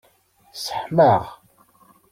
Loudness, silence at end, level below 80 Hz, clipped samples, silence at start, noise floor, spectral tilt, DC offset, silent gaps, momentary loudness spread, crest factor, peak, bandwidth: -20 LUFS; 0.75 s; -58 dBFS; under 0.1%; 0.55 s; -58 dBFS; -6 dB/octave; under 0.1%; none; 22 LU; 20 dB; -4 dBFS; 16.5 kHz